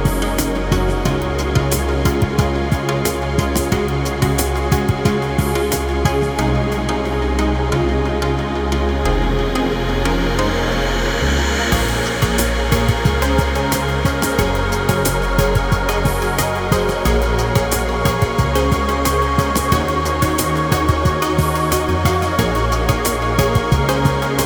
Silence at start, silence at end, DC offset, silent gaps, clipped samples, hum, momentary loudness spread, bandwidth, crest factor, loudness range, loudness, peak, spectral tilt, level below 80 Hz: 0 s; 0 s; under 0.1%; none; under 0.1%; none; 2 LU; over 20 kHz; 16 dB; 1 LU; -17 LUFS; 0 dBFS; -5 dB/octave; -22 dBFS